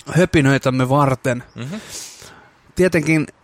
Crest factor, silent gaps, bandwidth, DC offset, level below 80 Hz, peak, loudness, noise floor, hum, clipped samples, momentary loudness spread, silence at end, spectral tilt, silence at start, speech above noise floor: 16 dB; none; 16 kHz; under 0.1%; -44 dBFS; -2 dBFS; -17 LUFS; -46 dBFS; none; under 0.1%; 16 LU; 0.15 s; -6 dB/octave; 0.05 s; 29 dB